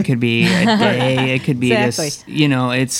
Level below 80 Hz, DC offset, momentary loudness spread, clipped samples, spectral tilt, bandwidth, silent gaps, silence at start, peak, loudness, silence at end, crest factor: -52 dBFS; under 0.1%; 4 LU; under 0.1%; -5 dB/octave; 16.5 kHz; none; 0 s; 0 dBFS; -15 LUFS; 0 s; 14 dB